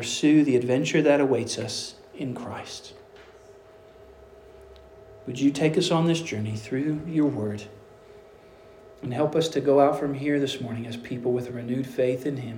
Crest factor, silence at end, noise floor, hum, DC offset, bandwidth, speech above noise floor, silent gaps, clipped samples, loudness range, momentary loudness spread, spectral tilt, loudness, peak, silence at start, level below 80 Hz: 20 dB; 0 s; -50 dBFS; none; under 0.1%; 16 kHz; 26 dB; none; under 0.1%; 11 LU; 16 LU; -5.5 dB/octave; -25 LUFS; -6 dBFS; 0 s; -62 dBFS